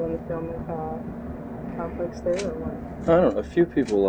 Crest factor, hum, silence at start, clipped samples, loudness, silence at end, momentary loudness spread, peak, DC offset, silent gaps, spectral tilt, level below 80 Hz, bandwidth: 18 dB; none; 0 s; under 0.1%; -26 LUFS; 0 s; 14 LU; -8 dBFS; under 0.1%; none; -7.5 dB/octave; -44 dBFS; 9.6 kHz